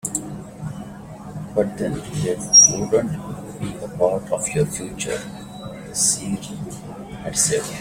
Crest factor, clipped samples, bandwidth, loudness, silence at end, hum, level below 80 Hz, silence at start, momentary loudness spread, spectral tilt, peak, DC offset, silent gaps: 20 dB; under 0.1%; 16.5 kHz; -19 LUFS; 0 s; none; -48 dBFS; 0.05 s; 22 LU; -2.5 dB/octave; -2 dBFS; under 0.1%; none